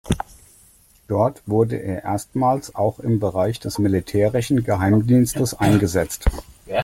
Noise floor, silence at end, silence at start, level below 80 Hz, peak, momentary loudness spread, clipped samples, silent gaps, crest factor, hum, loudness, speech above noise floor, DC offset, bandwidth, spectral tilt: -53 dBFS; 0 s; 0.05 s; -34 dBFS; -4 dBFS; 9 LU; under 0.1%; none; 16 dB; none; -20 LUFS; 34 dB; under 0.1%; 16.5 kHz; -6.5 dB/octave